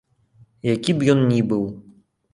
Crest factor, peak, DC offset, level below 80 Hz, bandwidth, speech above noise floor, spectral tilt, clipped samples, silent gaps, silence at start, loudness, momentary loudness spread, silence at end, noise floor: 18 dB; -4 dBFS; under 0.1%; -56 dBFS; 11.5 kHz; 36 dB; -7 dB/octave; under 0.1%; none; 0.65 s; -20 LUFS; 12 LU; 0.5 s; -55 dBFS